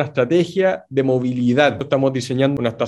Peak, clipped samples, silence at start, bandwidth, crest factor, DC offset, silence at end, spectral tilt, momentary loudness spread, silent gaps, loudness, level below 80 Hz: 0 dBFS; under 0.1%; 0 s; 12 kHz; 18 dB; under 0.1%; 0 s; -6.5 dB/octave; 3 LU; none; -18 LUFS; -56 dBFS